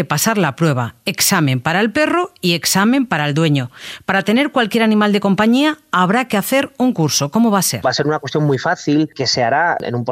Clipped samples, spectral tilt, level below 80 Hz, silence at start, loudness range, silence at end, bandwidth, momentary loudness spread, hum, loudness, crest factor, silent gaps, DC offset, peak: under 0.1%; -4.5 dB/octave; -56 dBFS; 0 s; 1 LU; 0 s; 16 kHz; 4 LU; none; -15 LUFS; 14 dB; none; under 0.1%; 0 dBFS